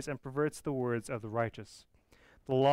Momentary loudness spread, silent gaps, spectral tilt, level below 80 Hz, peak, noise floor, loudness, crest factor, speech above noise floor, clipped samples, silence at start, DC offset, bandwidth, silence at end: 18 LU; none; -6.5 dB/octave; -64 dBFS; -18 dBFS; -63 dBFS; -35 LUFS; 16 dB; 30 dB; under 0.1%; 0 s; under 0.1%; 16 kHz; 0 s